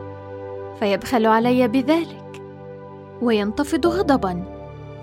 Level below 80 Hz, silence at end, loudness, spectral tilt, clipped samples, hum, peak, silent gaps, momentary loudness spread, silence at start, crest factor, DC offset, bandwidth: -48 dBFS; 0 s; -20 LUFS; -6 dB/octave; under 0.1%; none; -4 dBFS; none; 20 LU; 0 s; 18 dB; under 0.1%; 16.5 kHz